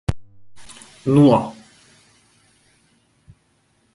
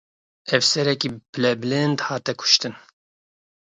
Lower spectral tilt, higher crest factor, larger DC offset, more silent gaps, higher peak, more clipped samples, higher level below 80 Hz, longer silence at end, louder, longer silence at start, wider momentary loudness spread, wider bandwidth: first, -8 dB/octave vs -3.5 dB/octave; about the same, 20 dB vs 22 dB; neither; second, none vs 1.29-1.33 s; about the same, -2 dBFS vs 0 dBFS; neither; first, -42 dBFS vs -66 dBFS; first, 2.45 s vs 0.9 s; first, -17 LUFS vs -20 LUFS; second, 0.1 s vs 0.45 s; first, 28 LU vs 9 LU; about the same, 11.5 kHz vs 11 kHz